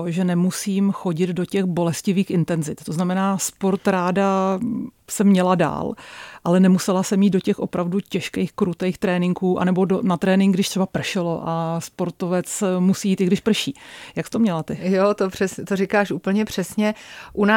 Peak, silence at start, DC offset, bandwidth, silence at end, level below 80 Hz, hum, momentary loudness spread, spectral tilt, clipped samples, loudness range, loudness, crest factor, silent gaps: -4 dBFS; 0 s; under 0.1%; 16.5 kHz; 0 s; -58 dBFS; none; 9 LU; -6 dB/octave; under 0.1%; 2 LU; -21 LUFS; 16 dB; none